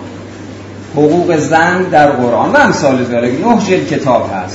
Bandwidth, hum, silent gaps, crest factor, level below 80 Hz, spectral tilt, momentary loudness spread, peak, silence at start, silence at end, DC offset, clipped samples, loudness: 8 kHz; none; none; 12 dB; -46 dBFS; -5.5 dB/octave; 19 LU; 0 dBFS; 0 s; 0 s; under 0.1%; 0.4%; -11 LUFS